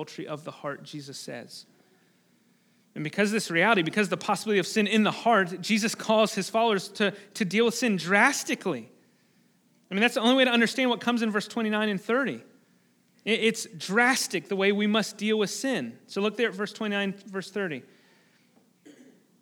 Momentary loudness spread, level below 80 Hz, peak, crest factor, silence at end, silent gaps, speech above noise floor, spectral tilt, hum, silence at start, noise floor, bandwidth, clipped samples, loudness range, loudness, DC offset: 15 LU; -88 dBFS; -6 dBFS; 22 dB; 1.6 s; none; 38 dB; -4 dB/octave; none; 0 s; -65 dBFS; 18.5 kHz; under 0.1%; 6 LU; -26 LUFS; under 0.1%